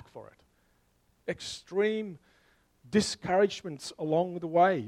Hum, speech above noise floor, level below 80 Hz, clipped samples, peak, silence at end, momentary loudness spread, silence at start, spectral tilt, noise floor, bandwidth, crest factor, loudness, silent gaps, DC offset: none; 40 dB; -66 dBFS; under 0.1%; -12 dBFS; 0 s; 16 LU; 0.15 s; -5 dB/octave; -69 dBFS; 13 kHz; 18 dB; -30 LUFS; none; under 0.1%